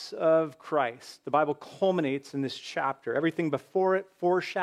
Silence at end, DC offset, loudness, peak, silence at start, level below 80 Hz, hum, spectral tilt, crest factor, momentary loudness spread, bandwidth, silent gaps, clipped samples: 0 s; under 0.1%; -29 LUFS; -12 dBFS; 0 s; -84 dBFS; none; -6 dB/octave; 16 dB; 7 LU; 13 kHz; none; under 0.1%